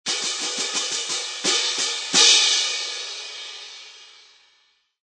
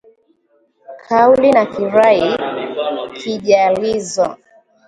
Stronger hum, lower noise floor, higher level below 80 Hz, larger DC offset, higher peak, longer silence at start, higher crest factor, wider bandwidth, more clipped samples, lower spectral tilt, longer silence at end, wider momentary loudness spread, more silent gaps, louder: first, 60 Hz at -70 dBFS vs none; first, -64 dBFS vs -59 dBFS; second, -82 dBFS vs -54 dBFS; neither; about the same, -2 dBFS vs 0 dBFS; second, 0.05 s vs 0.9 s; first, 22 dB vs 16 dB; about the same, 10.5 kHz vs 11 kHz; neither; second, 1.5 dB/octave vs -4.5 dB/octave; first, 0.95 s vs 0.55 s; first, 21 LU vs 11 LU; neither; second, -19 LUFS vs -15 LUFS